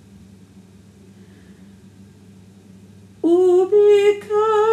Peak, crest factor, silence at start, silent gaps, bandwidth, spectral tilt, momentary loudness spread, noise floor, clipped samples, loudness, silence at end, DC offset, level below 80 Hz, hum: -6 dBFS; 14 dB; 3.25 s; none; 9.6 kHz; -6 dB/octave; 6 LU; -46 dBFS; under 0.1%; -16 LUFS; 0 s; under 0.1%; -64 dBFS; none